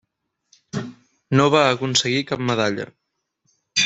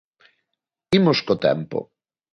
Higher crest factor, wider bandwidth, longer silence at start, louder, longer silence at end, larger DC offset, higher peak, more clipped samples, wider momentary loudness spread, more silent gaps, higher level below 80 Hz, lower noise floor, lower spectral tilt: about the same, 20 dB vs 20 dB; second, 8.4 kHz vs 10.5 kHz; second, 0.75 s vs 0.9 s; about the same, -20 LUFS vs -21 LUFS; second, 0 s vs 0.5 s; neither; about the same, -2 dBFS vs -4 dBFS; neither; first, 16 LU vs 12 LU; neither; about the same, -60 dBFS vs -56 dBFS; second, -73 dBFS vs -81 dBFS; second, -4 dB/octave vs -7 dB/octave